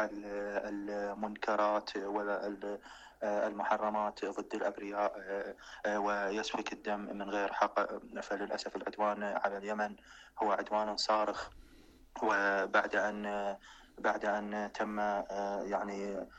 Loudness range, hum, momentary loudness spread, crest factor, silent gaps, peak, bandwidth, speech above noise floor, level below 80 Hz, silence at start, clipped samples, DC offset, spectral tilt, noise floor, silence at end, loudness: 3 LU; none; 9 LU; 20 dB; none; -16 dBFS; 8.8 kHz; 24 dB; -66 dBFS; 0 s; under 0.1%; under 0.1%; -4 dB/octave; -59 dBFS; 0 s; -36 LUFS